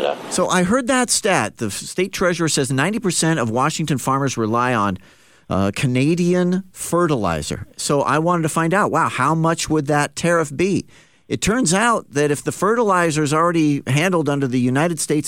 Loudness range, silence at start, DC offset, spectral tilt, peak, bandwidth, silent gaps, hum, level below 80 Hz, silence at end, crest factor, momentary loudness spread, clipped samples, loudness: 2 LU; 0 s; 0.2%; -4.5 dB/octave; -2 dBFS; 16.5 kHz; none; none; -48 dBFS; 0 s; 16 dB; 6 LU; under 0.1%; -19 LUFS